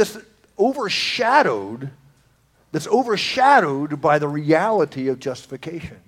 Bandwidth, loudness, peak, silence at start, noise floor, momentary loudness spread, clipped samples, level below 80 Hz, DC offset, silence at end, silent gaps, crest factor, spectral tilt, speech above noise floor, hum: 16.5 kHz; -19 LUFS; 0 dBFS; 0 s; -59 dBFS; 17 LU; under 0.1%; -58 dBFS; under 0.1%; 0.15 s; none; 20 dB; -4.5 dB/octave; 39 dB; none